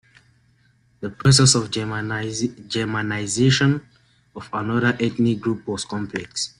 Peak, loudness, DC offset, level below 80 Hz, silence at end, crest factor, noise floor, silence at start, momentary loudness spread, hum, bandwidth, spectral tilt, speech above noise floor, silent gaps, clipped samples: -2 dBFS; -21 LUFS; under 0.1%; -52 dBFS; 0.1 s; 20 dB; -60 dBFS; 1 s; 13 LU; none; 11.5 kHz; -4 dB/octave; 39 dB; none; under 0.1%